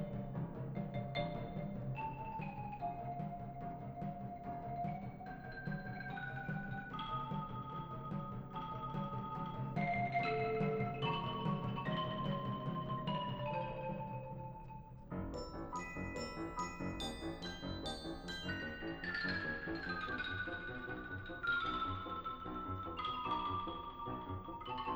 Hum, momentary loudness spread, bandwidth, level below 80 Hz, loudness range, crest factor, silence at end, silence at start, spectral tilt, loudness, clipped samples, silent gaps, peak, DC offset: none; 8 LU; over 20 kHz; -56 dBFS; 6 LU; 16 dB; 0 s; 0 s; -6.5 dB/octave; -42 LUFS; under 0.1%; none; -26 dBFS; under 0.1%